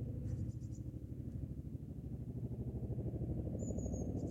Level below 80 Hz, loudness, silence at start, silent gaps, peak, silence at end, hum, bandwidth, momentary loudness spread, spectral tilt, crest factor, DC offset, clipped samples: -50 dBFS; -44 LUFS; 0 s; none; -28 dBFS; 0 s; none; 8.2 kHz; 6 LU; -9 dB/octave; 14 dB; under 0.1%; under 0.1%